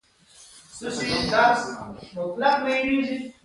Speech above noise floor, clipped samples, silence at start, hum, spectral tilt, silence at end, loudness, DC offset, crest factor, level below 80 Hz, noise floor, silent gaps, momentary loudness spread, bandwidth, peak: 29 dB; under 0.1%; 0.4 s; none; -4 dB/octave; 0.15 s; -23 LUFS; under 0.1%; 20 dB; -54 dBFS; -53 dBFS; none; 17 LU; 11.5 kHz; -6 dBFS